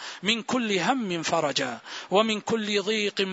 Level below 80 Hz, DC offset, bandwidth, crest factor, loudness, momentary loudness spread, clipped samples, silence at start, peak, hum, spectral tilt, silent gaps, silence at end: -70 dBFS; under 0.1%; 8 kHz; 20 dB; -26 LUFS; 3 LU; under 0.1%; 0 s; -8 dBFS; none; -3.5 dB/octave; none; 0 s